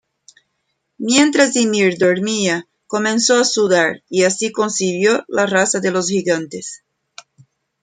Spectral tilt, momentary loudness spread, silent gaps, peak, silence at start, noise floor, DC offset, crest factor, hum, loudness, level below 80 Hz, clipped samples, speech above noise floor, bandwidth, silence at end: -3 dB/octave; 8 LU; none; 0 dBFS; 1 s; -71 dBFS; under 0.1%; 16 dB; none; -16 LUFS; -64 dBFS; under 0.1%; 55 dB; 9.6 kHz; 1.05 s